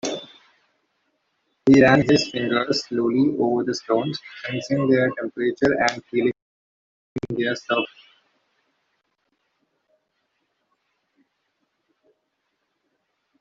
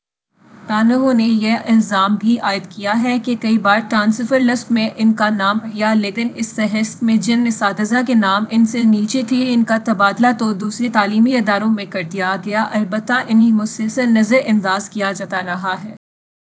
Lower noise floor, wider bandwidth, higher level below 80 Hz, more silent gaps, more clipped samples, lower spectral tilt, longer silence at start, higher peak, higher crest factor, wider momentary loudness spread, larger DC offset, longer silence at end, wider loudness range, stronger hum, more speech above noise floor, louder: first, -75 dBFS vs -54 dBFS; about the same, 7.8 kHz vs 8 kHz; first, -58 dBFS vs -66 dBFS; first, 6.42-7.16 s vs none; neither; about the same, -5.5 dB/octave vs -5 dB/octave; second, 0.05 s vs 0.6 s; about the same, -2 dBFS vs 0 dBFS; first, 22 dB vs 16 dB; first, 15 LU vs 7 LU; neither; first, 5.55 s vs 0.6 s; first, 11 LU vs 1 LU; neither; first, 55 dB vs 38 dB; second, -21 LUFS vs -16 LUFS